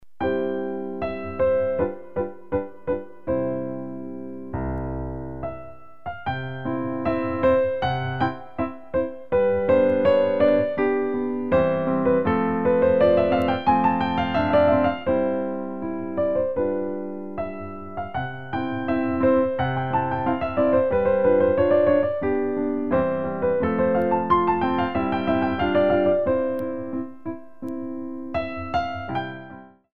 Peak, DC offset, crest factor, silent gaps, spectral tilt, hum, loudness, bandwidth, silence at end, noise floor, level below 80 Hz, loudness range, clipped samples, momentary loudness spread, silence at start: -6 dBFS; 0.9%; 16 dB; none; -9 dB/octave; none; -23 LUFS; 5.2 kHz; 0.05 s; -43 dBFS; -46 dBFS; 9 LU; under 0.1%; 13 LU; 0 s